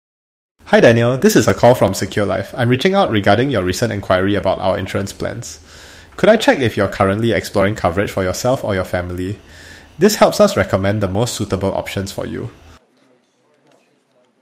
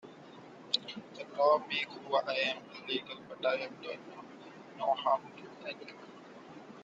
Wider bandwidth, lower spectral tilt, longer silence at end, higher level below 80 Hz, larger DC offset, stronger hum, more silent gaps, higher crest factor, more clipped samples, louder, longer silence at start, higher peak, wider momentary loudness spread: first, 16 kHz vs 9 kHz; first, -5.5 dB/octave vs -3.5 dB/octave; first, 1.9 s vs 0 s; first, -44 dBFS vs -84 dBFS; neither; neither; neither; second, 16 dB vs 22 dB; neither; first, -16 LUFS vs -34 LUFS; first, 0.65 s vs 0.05 s; first, 0 dBFS vs -14 dBFS; second, 13 LU vs 21 LU